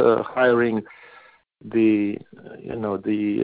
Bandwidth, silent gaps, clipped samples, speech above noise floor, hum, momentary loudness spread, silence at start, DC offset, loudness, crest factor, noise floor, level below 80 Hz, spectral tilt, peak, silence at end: 4 kHz; none; under 0.1%; 30 dB; none; 19 LU; 0 s; under 0.1%; -22 LUFS; 16 dB; -51 dBFS; -60 dBFS; -10.5 dB/octave; -6 dBFS; 0 s